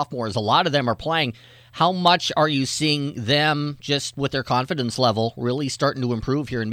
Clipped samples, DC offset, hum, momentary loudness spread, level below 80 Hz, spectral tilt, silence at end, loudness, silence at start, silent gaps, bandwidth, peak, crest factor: under 0.1%; under 0.1%; none; 7 LU; -52 dBFS; -4.5 dB/octave; 0 s; -22 LUFS; 0 s; none; 15.5 kHz; -4 dBFS; 18 dB